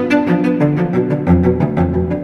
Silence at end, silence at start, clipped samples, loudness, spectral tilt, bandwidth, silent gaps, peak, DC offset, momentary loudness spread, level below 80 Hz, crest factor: 0 s; 0 s; under 0.1%; -15 LUFS; -9.5 dB/octave; 6.6 kHz; none; 0 dBFS; under 0.1%; 3 LU; -32 dBFS; 14 dB